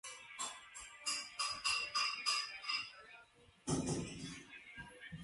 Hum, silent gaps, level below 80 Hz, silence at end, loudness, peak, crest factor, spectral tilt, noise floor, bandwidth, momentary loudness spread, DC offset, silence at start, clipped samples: none; none; -66 dBFS; 0 s; -39 LUFS; -22 dBFS; 20 dB; -2 dB/octave; -65 dBFS; 11.5 kHz; 17 LU; under 0.1%; 0.05 s; under 0.1%